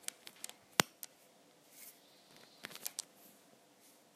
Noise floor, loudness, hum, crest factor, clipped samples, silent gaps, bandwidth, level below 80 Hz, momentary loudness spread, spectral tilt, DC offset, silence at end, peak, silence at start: -66 dBFS; -40 LUFS; none; 44 dB; under 0.1%; none; 15.5 kHz; -78 dBFS; 27 LU; -1 dB/octave; under 0.1%; 1.15 s; -2 dBFS; 0.25 s